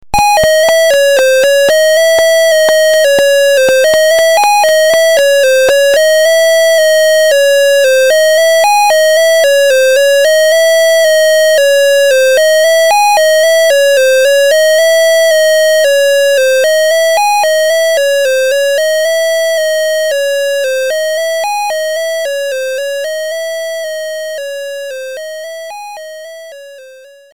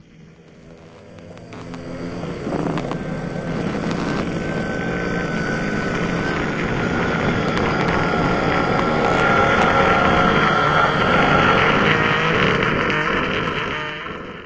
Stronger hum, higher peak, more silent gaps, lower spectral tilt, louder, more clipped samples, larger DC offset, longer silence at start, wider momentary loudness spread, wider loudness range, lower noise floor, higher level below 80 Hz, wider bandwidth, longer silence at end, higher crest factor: neither; about the same, -2 dBFS vs -2 dBFS; neither; second, 0.5 dB/octave vs -6 dB/octave; first, -8 LUFS vs -18 LUFS; neither; first, 2% vs under 0.1%; about the same, 0.15 s vs 0.2 s; about the same, 11 LU vs 12 LU; about the same, 9 LU vs 11 LU; second, -36 dBFS vs -45 dBFS; second, -44 dBFS vs -38 dBFS; first, 19 kHz vs 8 kHz; first, 0.2 s vs 0 s; second, 8 dB vs 18 dB